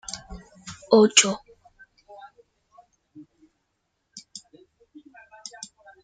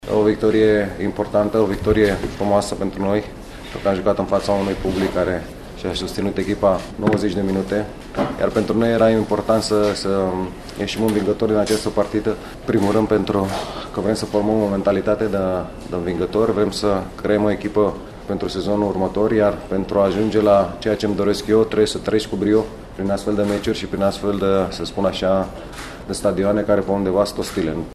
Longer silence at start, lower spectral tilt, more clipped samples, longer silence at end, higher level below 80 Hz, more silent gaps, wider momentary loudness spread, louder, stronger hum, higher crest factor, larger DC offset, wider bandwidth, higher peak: about the same, 0.1 s vs 0 s; second, -2 dB/octave vs -6 dB/octave; neither; first, 1.85 s vs 0 s; second, -58 dBFS vs -38 dBFS; neither; first, 29 LU vs 8 LU; about the same, -19 LUFS vs -20 LUFS; neither; first, 26 dB vs 18 dB; neither; second, 9.6 kHz vs 13.5 kHz; about the same, -2 dBFS vs -2 dBFS